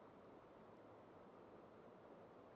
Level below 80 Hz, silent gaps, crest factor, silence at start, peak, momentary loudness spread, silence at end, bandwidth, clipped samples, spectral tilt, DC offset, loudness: -86 dBFS; none; 12 dB; 0 s; -50 dBFS; 1 LU; 0 s; 6.2 kHz; under 0.1%; -5.5 dB/octave; under 0.1%; -63 LUFS